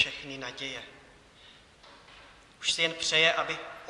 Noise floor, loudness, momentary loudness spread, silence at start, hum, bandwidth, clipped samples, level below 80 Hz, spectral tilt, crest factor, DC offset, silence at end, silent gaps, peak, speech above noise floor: -56 dBFS; -28 LUFS; 15 LU; 0 s; none; 12 kHz; under 0.1%; -66 dBFS; -1 dB/octave; 24 dB; under 0.1%; 0 s; none; -10 dBFS; 26 dB